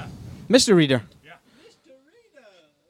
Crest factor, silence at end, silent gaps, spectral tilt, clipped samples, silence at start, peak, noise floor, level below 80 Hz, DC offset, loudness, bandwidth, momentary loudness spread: 22 dB; 1.85 s; none; -4.5 dB/octave; under 0.1%; 0 s; -2 dBFS; -55 dBFS; -56 dBFS; under 0.1%; -18 LUFS; 16 kHz; 23 LU